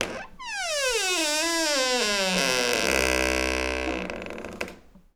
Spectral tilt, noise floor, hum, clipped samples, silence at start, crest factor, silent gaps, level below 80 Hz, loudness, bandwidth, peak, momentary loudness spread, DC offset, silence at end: -2 dB/octave; -46 dBFS; none; under 0.1%; 0 s; 20 dB; none; -42 dBFS; -24 LUFS; over 20 kHz; -6 dBFS; 13 LU; under 0.1%; 0.15 s